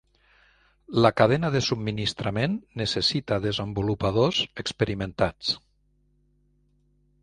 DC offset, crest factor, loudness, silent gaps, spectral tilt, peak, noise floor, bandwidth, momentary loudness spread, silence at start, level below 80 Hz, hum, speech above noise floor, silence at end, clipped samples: under 0.1%; 24 dB; -25 LUFS; none; -5.5 dB/octave; -2 dBFS; -66 dBFS; 11 kHz; 7 LU; 0.9 s; -50 dBFS; 50 Hz at -50 dBFS; 41 dB; 1.65 s; under 0.1%